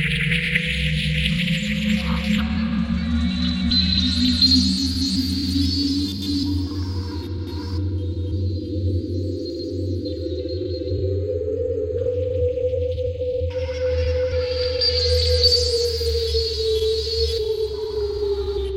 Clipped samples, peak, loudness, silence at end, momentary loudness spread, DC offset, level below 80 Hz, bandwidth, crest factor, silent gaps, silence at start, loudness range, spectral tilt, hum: under 0.1%; -4 dBFS; -21 LUFS; 0 s; 9 LU; under 0.1%; -32 dBFS; 16 kHz; 18 dB; none; 0 s; 7 LU; -5.5 dB/octave; none